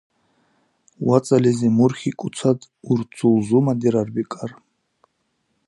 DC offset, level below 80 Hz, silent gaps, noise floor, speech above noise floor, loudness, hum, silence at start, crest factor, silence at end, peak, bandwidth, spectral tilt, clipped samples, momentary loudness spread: under 0.1%; -62 dBFS; none; -71 dBFS; 52 dB; -20 LUFS; none; 1 s; 20 dB; 1.15 s; -2 dBFS; 11.5 kHz; -7.5 dB/octave; under 0.1%; 10 LU